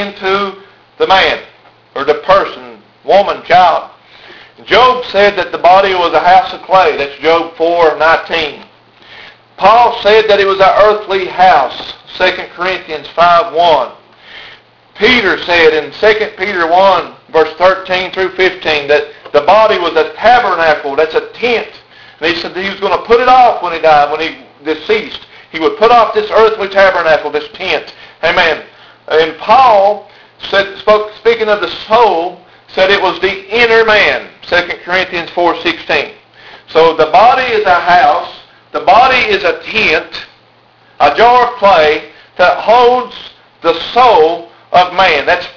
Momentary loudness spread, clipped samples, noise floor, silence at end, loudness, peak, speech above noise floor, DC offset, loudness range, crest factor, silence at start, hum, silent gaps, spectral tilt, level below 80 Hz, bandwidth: 11 LU; 0.9%; -46 dBFS; 0.05 s; -10 LUFS; 0 dBFS; 37 dB; under 0.1%; 3 LU; 10 dB; 0 s; none; none; -4 dB/octave; -42 dBFS; 5.4 kHz